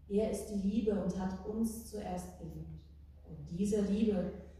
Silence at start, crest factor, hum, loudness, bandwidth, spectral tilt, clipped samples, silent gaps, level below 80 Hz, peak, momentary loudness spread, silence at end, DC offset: 0 s; 16 dB; none; -36 LUFS; 15 kHz; -7 dB/octave; under 0.1%; none; -54 dBFS; -20 dBFS; 16 LU; 0 s; under 0.1%